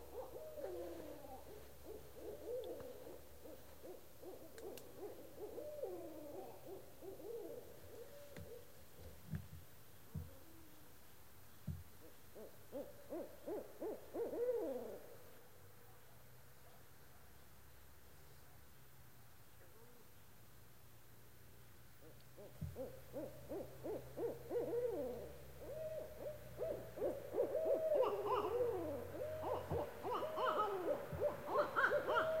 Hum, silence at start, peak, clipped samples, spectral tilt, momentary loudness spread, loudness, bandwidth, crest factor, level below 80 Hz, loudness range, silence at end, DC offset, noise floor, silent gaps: none; 0 s; -24 dBFS; under 0.1%; -5.5 dB/octave; 24 LU; -45 LUFS; 16 kHz; 22 dB; -68 dBFS; 22 LU; 0 s; 0.1%; -65 dBFS; none